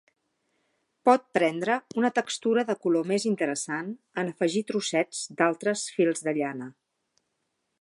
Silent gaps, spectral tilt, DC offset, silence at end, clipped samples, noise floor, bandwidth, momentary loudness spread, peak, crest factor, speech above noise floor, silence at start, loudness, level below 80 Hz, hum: none; -4 dB/octave; under 0.1%; 1.1 s; under 0.1%; -78 dBFS; 11.5 kHz; 9 LU; -6 dBFS; 22 dB; 52 dB; 1.05 s; -27 LUFS; -82 dBFS; none